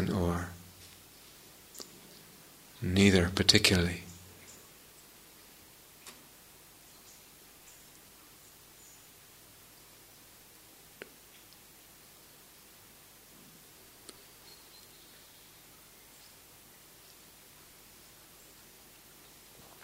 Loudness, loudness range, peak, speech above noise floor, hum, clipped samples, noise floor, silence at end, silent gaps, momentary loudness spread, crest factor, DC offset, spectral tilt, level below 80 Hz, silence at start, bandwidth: -27 LUFS; 25 LU; -4 dBFS; 30 dB; 50 Hz at -60 dBFS; under 0.1%; -56 dBFS; 13.75 s; none; 25 LU; 34 dB; under 0.1%; -4 dB/octave; -58 dBFS; 0 s; 16 kHz